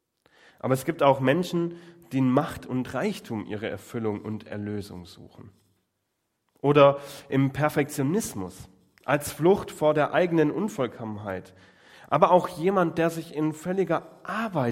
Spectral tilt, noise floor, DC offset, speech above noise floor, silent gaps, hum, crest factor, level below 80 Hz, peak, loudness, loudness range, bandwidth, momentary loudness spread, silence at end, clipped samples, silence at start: -6.5 dB/octave; -78 dBFS; under 0.1%; 52 dB; none; none; 22 dB; -62 dBFS; -4 dBFS; -26 LUFS; 8 LU; 16.5 kHz; 14 LU; 0 s; under 0.1%; 0.65 s